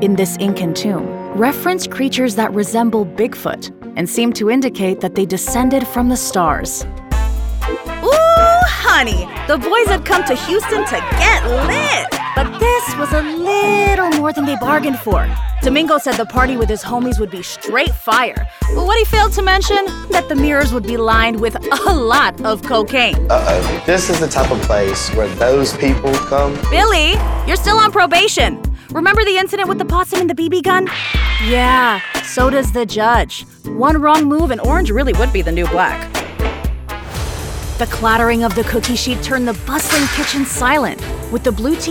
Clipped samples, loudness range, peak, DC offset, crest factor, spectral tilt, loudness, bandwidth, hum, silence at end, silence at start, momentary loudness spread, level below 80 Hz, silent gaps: under 0.1%; 4 LU; -2 dBFS; under 0.1%; 12 dB; -4.5 dB/octave; -15 LUFS; 18.5 kHz; none; 0 s; 0 s; 9 LU; -22 dBFS; none